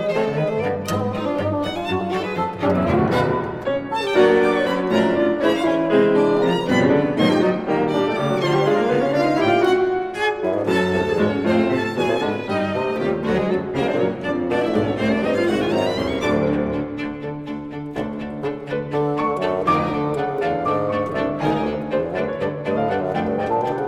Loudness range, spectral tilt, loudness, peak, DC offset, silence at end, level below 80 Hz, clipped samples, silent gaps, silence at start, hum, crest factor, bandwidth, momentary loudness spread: 5 LU; -6.5 dB/octave; -20 LUFS; -4 dBFS; under 0.1%; 0 s; -48 dBFS; under 0.1%; none; 0 s; none; 16 dB; 15 kHz; 7 LU